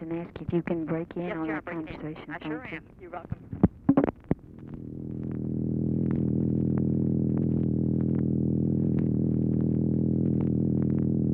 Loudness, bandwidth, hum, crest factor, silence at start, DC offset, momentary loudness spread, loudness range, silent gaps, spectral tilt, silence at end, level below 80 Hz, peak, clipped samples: -28 LUFS; 3.9 kHz; none; 20 dB; 0 s; under 0.1%; 12 LU; 6 LU; none; -12 dB/octave; 0 s; -50 dBFS; -8 dBFS; under 0.1%